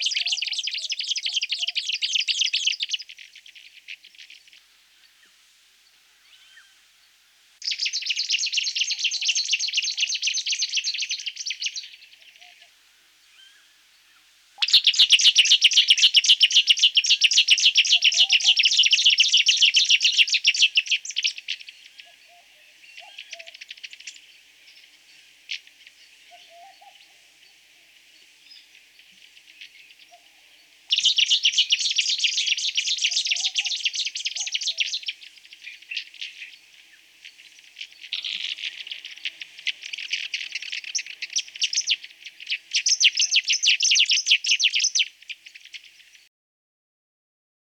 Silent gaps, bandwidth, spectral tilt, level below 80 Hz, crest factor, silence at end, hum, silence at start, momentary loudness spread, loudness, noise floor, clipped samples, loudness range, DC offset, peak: none; 19.5 kHz; 7 dB/octave; -84 dBFS; 18 dB; 1.85 s; none; 0 s; 24 LU; -19 LUFS; -58 dBFS; under 0.1%; 18 LU; under 0.1%; -6 dBFS